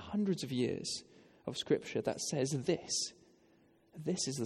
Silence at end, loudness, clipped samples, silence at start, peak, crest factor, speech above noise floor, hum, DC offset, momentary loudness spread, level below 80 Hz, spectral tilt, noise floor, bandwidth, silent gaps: 0 s; -36 LUFS; under 0.1%; 0 s; -18 dBFS; 18 dB; 32 dB; none; under 0.1%; 9 LU; -72 dBFS; -4 dB/octave; -68 dBFS; 14 kHz; none